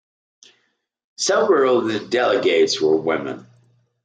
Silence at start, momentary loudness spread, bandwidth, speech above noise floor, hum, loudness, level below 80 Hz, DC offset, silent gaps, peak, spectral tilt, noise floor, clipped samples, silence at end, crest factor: 1.2 s; 9 LU; 9.4 kHz; 51 dB; none; -18 LUFS; -72 dBFS; under 0.1%; none; -6 dBFS; -3.5 dB/octave; -69 dBFS; under 0.1%; 0.65 s; 16 dB